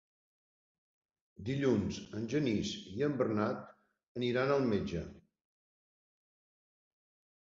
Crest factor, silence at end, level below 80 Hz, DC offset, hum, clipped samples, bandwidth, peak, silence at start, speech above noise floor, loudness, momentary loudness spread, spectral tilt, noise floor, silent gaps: 20 dB; 2.35 s; -60 dBFS; under 0.1%; none; under 0.1%; 7.6 kHz; -18 dBFS; 1.4 s; over 56 dB; -35 LUFS; 12 LU; -5.5 dB/octave; under -90 dBFS; 4.08-4.15 s